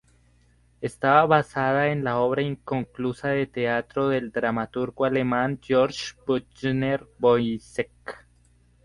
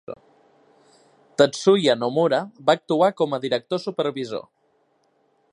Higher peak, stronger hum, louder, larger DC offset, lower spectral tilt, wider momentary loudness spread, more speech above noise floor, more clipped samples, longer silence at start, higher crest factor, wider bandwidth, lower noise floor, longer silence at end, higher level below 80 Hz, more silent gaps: about the same, -4 dBFS vs -2 dBFS; first, 60 Hz at -50 dBFS vs none; second, -24 LUFS vs -21 LUFS; neither; first, -6.5 dB/octave vs -5 dB/octave; second, 11 LU vs 14 LU; second, 36 dB vs 45 dB; neither; first, 0.8 s vs 0.1 s; about the same, 20 dB vs 22 dB; about the same, 11.5 kHz vs 11 kHz; second, -60 dBFS vs -65 dBFS; second, 0.65 s vs 1.1 s; first, -56 dBFS vs -72 dBFS; neither